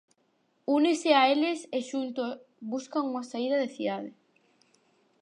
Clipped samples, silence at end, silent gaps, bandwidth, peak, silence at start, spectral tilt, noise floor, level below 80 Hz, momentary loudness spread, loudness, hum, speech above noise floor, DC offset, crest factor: under 0.1%; 1.1 s; none; 11 kHz; -10 dBFS; 0.7 s; -3.5 dB/octave; -71 dBFS; -86 dBFS; 15 LU; -28 LUFS; none; 44 dB; under 0.1%; 20 dB